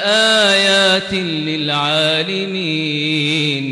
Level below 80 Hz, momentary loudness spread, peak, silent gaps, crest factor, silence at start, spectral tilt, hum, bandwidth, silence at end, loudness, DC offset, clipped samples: -56 dBFS; 8 LU; -4 dBFS; none; 12 dB; 0 s; -3.5 dB/octave; none; 15 kHz; 0 s; -14 LUFS; under 0.1%; under 0.1%